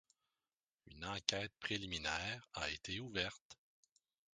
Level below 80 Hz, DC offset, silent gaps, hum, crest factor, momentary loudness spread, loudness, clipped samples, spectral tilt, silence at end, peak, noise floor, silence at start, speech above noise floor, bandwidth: -64 dBFS; under 0.1%; 3.41-3.50 s; none; 34 dB; 6 LU; -42 LUFS; under 0.1%; -2.5 dB/octave; 0.8 s; -12 dBFS; under -90 dBFS; 0.85 s; over 46 dB; 10 kHz